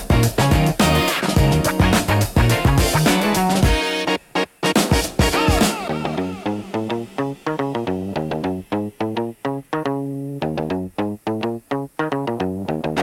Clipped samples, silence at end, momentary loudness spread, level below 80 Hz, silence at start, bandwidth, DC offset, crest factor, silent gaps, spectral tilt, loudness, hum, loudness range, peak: under 0.1%; 0 s; 9 LU; -30 dBFS; 0 s; 17 kHz; under 0.1%; 14 dB; none; -5 dB/octave; -20 LUFS; none; 8 LU; -4 dBFS